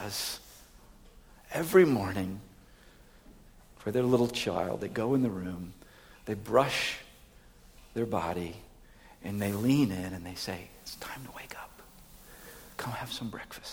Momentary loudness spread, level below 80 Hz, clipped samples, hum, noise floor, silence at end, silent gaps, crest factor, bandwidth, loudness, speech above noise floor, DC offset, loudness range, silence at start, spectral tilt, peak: 19 LU; -58 dBFS; under 0.1%; none; -56 dBFS; 0 s; none; 22 dB; over 20 kHz; -31 LUFS; 26 dB; under 0.1%; 5 LU; 0 s; -5.5 dB/octave; -10 dBFS